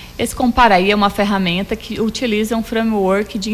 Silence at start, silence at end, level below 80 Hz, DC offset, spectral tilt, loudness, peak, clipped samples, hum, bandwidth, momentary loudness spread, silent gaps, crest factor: 0 s; 0 s; -36 dBFS; under 0.1%; -5 dB/octave; -16 LUFS; -2 dBFS; under 0.1%; none; 15.5 kHz; 9 LU; none; 14 dB